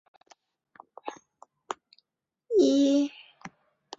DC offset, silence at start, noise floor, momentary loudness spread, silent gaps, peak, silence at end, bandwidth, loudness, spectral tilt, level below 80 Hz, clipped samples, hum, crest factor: under 0.1%; 1.05 s; -83 dBFS; 26 LU; none; -12 dBFS; 0.5 s; 7.8 kHz; -24 LUFS; -4 dB/octave; -74 dBFS; under 0.1%; none; 18 dB